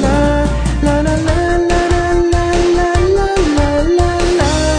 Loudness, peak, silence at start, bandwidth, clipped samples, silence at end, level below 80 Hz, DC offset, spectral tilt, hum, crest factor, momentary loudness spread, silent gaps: -13 LUFS; 0 dBFS; 0 s; 10.5 kHz; under 0.1%; 0 s; -18 dBFS; under 0.1%; -6 dB/octave; none; 12 dB; 2 LU; none